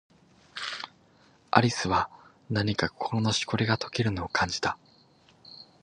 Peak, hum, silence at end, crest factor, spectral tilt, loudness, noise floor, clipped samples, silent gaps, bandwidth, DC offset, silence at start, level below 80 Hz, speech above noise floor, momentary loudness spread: -2 dBFS; none; 0.2 s; 28 dB; -4.5 dB/octave; -28 LUFS; -60 dBFS; under 0.1%; none; 10.5 kHz; under 0.1%; 0.55 s; -52 dBFS; 33 dB; 18 LU